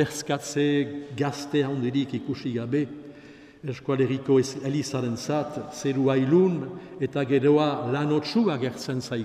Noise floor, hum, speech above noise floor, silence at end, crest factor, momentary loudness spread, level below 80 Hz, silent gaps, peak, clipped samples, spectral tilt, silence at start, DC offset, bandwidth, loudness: -48 dBFS; none; 23 dB; 0 s; 16 dB; 11 LU; -66 dBFS; none; -10 dBFS; under 0.1%; -6 dB/octave; 0 s; under 0.1%; 14.5 kHz; -26 LUFS